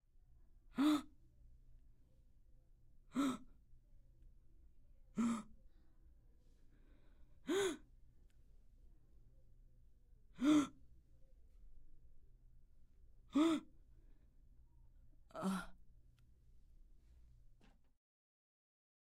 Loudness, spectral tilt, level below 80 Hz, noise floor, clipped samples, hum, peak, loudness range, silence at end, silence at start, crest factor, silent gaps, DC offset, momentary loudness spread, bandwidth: -40 LUFS; -5 dB/octave; -66 dBFS; -67 dBFS; under 0.1%; none; -24 dBFS; 8 LU; 2.4 s; 0.75 s; 22 dB; none; under 0.1%; 16 LU; 15 kHz